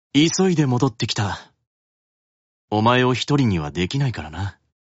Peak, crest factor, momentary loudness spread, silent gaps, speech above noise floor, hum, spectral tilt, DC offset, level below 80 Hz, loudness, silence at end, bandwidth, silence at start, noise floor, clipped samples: -6 dBFS; 16 dB; 13 LU; 1.67-2.68 s; over 71 dB; none; -5.5 dB/octave; under 0.1%; -48 dBFS; -20 LUFS; 0.3 s; 8.2 kHz; 0.15 s; under -90 dBFS; under 0.1%